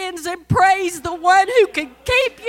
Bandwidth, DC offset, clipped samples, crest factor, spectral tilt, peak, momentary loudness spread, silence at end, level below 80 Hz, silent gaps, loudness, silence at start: 16.5 kHz; under 0.1%; under 0.1%; 14 dB; -4 dB/octave; -2 dBFS; 11 LU; 0 s; -42 dBFS; none; -16 LUFS; 0 s